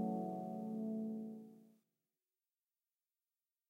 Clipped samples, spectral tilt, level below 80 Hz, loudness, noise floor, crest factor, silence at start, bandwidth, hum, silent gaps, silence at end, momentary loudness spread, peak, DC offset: under 0.1%; -10.5 dB/octave; under -90 dBFS; -44 LUFS; under -90 dBFS; 18 dB; 0 s; 15 kHz; none; none; 2 s; 12 LU; -30 dBFS; under 0.1%